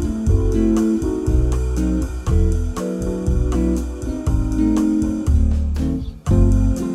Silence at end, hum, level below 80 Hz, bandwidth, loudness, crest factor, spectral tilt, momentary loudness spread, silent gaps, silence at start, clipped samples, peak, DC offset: 0 s; none; -20 dBFS; 13 kHz; -20 LUFS; 14 dB; -8 dB/octave; 6 LU; none; 0 s; under 0.1%; -4 dBFS; under 0.1%